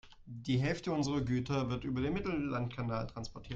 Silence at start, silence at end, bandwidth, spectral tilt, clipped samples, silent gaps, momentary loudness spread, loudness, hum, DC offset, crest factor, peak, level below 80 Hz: 0.05 s; 0 s; 7.8 kHz; -6.5 dB/octave; under 0.1%; none; 10 LU; -36 LUFS; none; under 0.1%; 16 dB; -20 dBFS; -54 dBFS